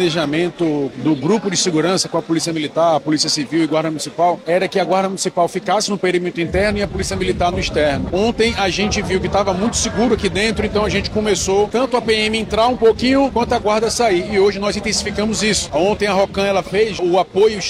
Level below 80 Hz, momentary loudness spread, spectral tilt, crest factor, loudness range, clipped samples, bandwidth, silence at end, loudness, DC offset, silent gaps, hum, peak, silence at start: -36 dBFS; 3 LU; -4 dB/octave; 14 dB; 2 LU; under 0.1%; 14 kHz; 0 s; -17 LUFS; under 0.1%; none; none; -4 dBFS; 0 s